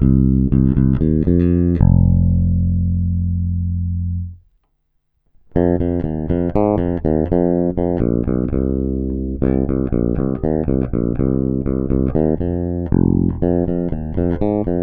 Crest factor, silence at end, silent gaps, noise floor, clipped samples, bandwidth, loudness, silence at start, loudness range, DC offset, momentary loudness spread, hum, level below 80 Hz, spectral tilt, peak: 16 dB; 0 s; none; -66 dBFS; under 0.1%; 3.3 kHz; -18 LUFS; 0 s; 6 LU; under 0.1%; 7 LU; none; -26 dBFS; -13.5 dB/octave; 0 dBFS